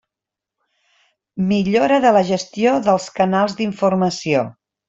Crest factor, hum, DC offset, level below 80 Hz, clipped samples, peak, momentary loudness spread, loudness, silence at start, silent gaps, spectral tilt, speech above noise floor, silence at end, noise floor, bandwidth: 16 dB; none; under 0.1%; -58 dBFS; under 0.1%; -2 dBFS; 7 LU; -17 LUFS; 1.35 s; none; -6 dB/octave; 69 dB; 0.4 s; -86 dBFS; 7.8 kHz